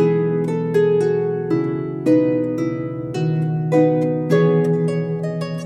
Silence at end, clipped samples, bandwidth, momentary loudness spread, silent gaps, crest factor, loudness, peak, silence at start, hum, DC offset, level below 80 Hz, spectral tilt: 0 s; under 0.1%; 9.6 kHz; 7 LU; none; 14 dB; -19 LUFS; -4 dBFS; 0 s; none; under 0.1%; -58 dBFS; -9 dB/octave